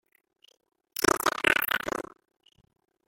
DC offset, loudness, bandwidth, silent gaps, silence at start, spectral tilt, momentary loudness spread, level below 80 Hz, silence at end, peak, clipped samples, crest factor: under 0.1%; -26 LUFS; 17 kHz; none; 1 s; -2 dB/octave; 14 LU; -60 dBFS; 1.05 s; -4 dBFS; under 0.1%; 28 dB